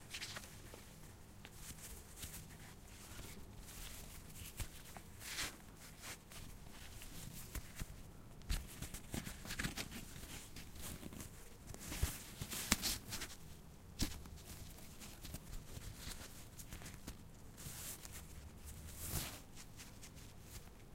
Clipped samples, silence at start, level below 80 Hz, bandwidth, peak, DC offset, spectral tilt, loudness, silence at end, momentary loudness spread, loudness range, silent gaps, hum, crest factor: under 0.1%; 0 s; -54 dBFS; 16 kHz; -8 dBFS; under 0.1%; -3 dB/octave; -49 LUFS; 0 s; 13 LU; 9 LU; none; none; 40 dB